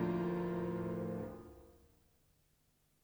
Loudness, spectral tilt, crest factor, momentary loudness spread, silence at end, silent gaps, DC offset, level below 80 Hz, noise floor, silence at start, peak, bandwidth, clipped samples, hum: -40 LUFS; -9 dB/octave; 16 dB; 19 LU; 1.25 s; none; under 0.1%; -64 dBFS; -75 dBFS; 0 s; -24 dBFS; over 20 kHz; under 0.1%; none